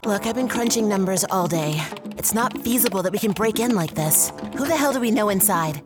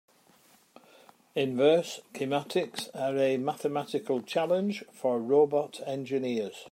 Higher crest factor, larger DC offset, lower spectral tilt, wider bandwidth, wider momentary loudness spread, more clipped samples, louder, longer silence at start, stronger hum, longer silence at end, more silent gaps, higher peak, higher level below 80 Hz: about the same, 18 dB vs 20 dB; neither; second, -4 dB/octave vs -5.5 dB/octave; first, over 20 kHz vs 16 kHz; second, 6 LU vs 11 LU; neither; first, -21 LUFS vs -29 LUFS; second, 0.05 s vs 1.35 s; neither; about the same, 0 s vs 0.05 s; neither; first, -4 dBFS vs -10 dBFS; first, -54 dBFS vs -82 dBFS